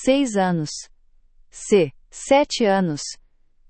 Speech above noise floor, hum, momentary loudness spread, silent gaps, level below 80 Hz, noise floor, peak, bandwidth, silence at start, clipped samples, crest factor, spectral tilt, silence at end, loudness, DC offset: 33 dB; none; 16 LU; none; -52 dBFS; -53 dBFS; -4 dBFS; 8.8 kHz; 0 s; under 0.1%; 18 dB; -5 dB/octave; 0.55 s; -20 LUFS; under 0.1%